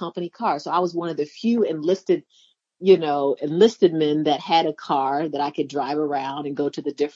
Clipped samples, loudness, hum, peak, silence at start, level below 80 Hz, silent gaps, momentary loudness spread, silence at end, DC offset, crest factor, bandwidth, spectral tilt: under 0.1%; -22 LUFS; none; -4 dBFS; 0 s; -78 dBFS; none; 9 LU; 0.05 s; under 0.1%; 18 dB; 7.6 kHz; -6 dB/octave